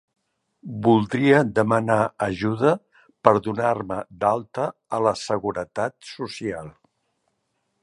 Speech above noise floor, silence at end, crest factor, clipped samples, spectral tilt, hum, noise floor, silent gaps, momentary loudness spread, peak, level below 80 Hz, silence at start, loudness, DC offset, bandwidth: 52 dB; 1.15 s; 22 dB; under 0.1%; -6.5 dB/octave; none; -74 dBFS; none; 12 LU; 0 dBFS; -56 dBFS; 0.65 s; -22 LUFS; under 0.1%; 11.5 kHz